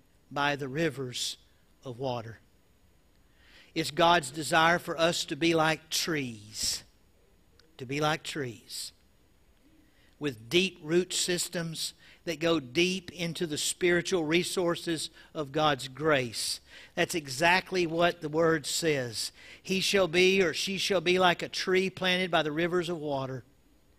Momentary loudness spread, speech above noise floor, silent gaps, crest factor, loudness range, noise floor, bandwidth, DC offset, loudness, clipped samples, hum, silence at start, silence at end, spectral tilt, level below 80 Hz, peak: 13 LU; 36 dB; none; 20 dB; 8 LU; -65 dBFS; 15.5 kHz; under 0.1%; -29 LUFS; under 0.1%; none; 0.3 s; 0.6 s; -3.5 dB/octave; -62 dBFS; -10 dBFS